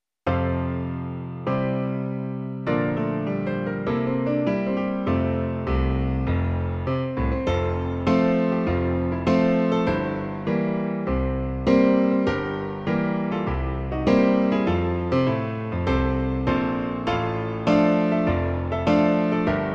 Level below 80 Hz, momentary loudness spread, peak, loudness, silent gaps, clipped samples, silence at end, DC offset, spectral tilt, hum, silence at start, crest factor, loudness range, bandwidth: -36 dBFS; 7 LU; -4 dBFS; -24 LUFS; none; under 0.1%; 0 s; under 0.1%; -8.5 dB/octave; none; 0.25 s; 18 dB; 3 LU; 7.4 kHz